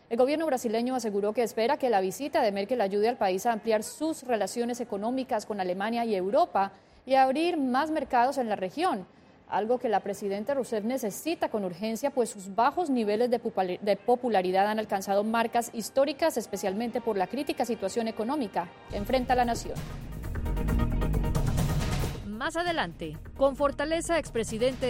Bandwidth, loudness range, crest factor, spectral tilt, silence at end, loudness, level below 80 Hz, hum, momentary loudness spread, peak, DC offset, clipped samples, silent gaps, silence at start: 16.5 kHz; 3 LU; 16 dB; -5.5 dB/octave; 0 s; -29 LUFS; -40 dBFS; none; 7 LU; -12 dBFS; under 0.1%; under 0.1%; none; 0.1 s